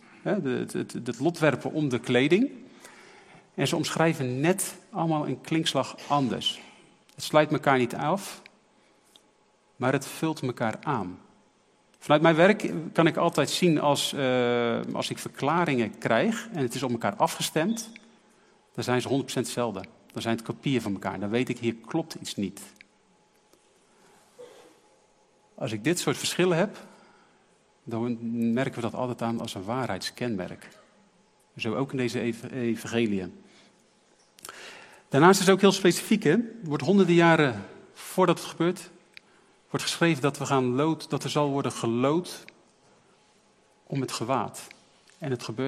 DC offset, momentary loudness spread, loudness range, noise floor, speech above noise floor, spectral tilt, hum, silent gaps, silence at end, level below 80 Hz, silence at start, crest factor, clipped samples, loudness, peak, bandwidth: under 0.1%; 15 LU; 9 LU; -64 dBFS; 38 dB; -5 dB/octave; none; none; 0 s; -72 dBFS; 0.25 s; 24 dB; under 0.1%; -26 LUFS; -4 dBFS; 15.5 kHz